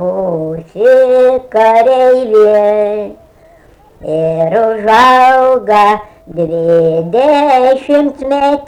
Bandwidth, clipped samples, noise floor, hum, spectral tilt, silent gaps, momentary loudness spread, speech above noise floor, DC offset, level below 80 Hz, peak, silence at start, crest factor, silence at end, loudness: 11 kHz; under 0.1%; -42 dBFS; none; -6 dB/octave; none; 11 LU; 33 dB; under 0.1%; -46 dBFS; 0 dBFS; 0 s; 10 dB; 0 s; -9 LUFS